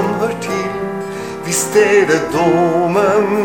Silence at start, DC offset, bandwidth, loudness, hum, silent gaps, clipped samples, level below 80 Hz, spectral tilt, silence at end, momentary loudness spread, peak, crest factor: 0 s; 0.4%; 16.5 kHz; -15 LUFS; none; none; under 0.1%; -50 dBFS; -4.5 dB/octave; 0 s; 11 LU; 0 dBFS; 14 dB